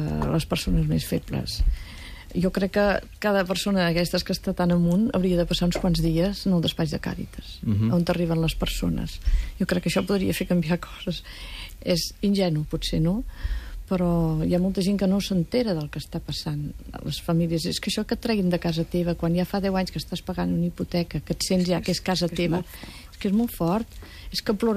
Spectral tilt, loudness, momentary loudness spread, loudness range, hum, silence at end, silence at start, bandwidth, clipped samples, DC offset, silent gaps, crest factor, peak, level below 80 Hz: -6 dB/octave; -25 LUFS; 10 LU; 3 LU; none; 0 s; 0 s; 15.5 kHz; under 0.1%; under 0.1%; none; 14 dB; -10 dBFS; -36 dBFS